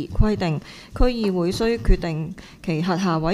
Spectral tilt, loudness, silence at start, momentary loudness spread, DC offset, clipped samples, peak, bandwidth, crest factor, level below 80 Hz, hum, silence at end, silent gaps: -7 dB/octave; -23 LUFS; 0 s; 9 LU; under 0.1%; under 0.1%; -2 dBFS; 12.5 kHz; 18 dB; -26 dBFS; none; 0 s; none